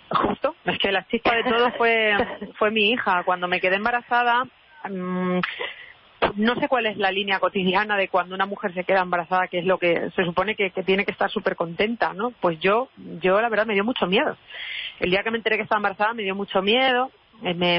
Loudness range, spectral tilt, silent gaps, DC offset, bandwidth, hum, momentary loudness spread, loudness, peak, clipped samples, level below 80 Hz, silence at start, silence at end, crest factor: 3 LU; -9.5 dB/octave; none; under 0.1%; 5.8 kHz; none; 8 LU; -22 LUFS; -10 dBFS; under 0.1%; -56 dBFS; 0.1 s; 0 s; 14 dB